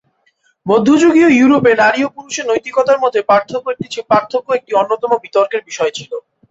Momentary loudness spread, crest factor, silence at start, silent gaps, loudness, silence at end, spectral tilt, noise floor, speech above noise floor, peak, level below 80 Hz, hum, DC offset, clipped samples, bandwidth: 13 LU; 14 dB; 0.65 s; none; -13 LUFS; 0.3 s; -4.5 dB/octave; -59 dBFS; 46 dB; 0 dBFS; -56 dBFS; none; under 0.1%; under 0.1%; 8 kHz